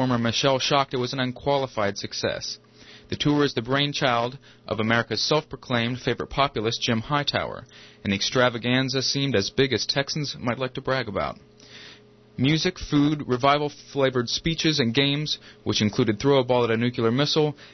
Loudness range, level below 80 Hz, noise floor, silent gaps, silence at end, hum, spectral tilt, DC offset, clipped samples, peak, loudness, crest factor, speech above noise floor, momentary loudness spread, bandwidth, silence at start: 3 LU; -52 dBFS; -50 dBFS; none; 0.05 s; none; -4.5 dB/octave; under 0.1%; under 0.1%; -6 dBFS; -24 LUFS; 18 dB; 26 dB; 8 LU; 6.4 kHz; 0 s